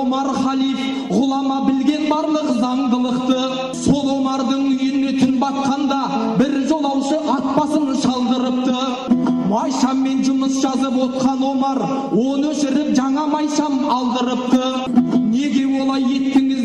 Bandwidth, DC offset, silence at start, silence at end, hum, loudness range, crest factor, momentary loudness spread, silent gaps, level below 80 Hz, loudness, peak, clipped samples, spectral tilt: 10.5 kHz; under 0.1%; 0 s; 0 s; none; 1 LU; 12 dB; 2 LU; none; -52 dBFS; -18 LUFS; -6 dBFS; under 0.1%; -5 dB/octave